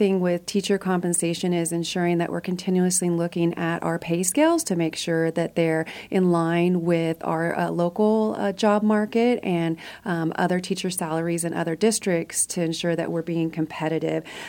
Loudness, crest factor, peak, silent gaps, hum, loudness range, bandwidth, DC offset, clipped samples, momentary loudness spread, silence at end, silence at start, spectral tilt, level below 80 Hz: -23 LUFS; 16 dB; -8 dBFS; none; none; 2 LU; 17.5 kHz; under 0.1%; under 0.1%; 6 LU; 0 s; 0 s; -5 dB/octave; -64 dBFS